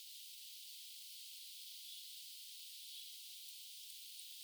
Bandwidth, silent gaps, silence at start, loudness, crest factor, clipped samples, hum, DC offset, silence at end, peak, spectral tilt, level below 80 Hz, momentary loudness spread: over 20 kHz; none; 0 s; -50 LUFS; 16 dB; under 0.1%; none; under 0.1%; 0 s; -38 dBFS; 8.5 dB/octave; under -90 dBFS; 1 LU